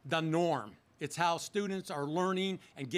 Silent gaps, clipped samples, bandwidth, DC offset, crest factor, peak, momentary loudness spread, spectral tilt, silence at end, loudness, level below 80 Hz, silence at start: none; under 0.1%; 15.5 kHz; under 0.1%; 18 dB; -16 dBFS; 10 LU; -5 dB/octave; 0 s; -34 LUFS; -78 dBFS; 0.05 s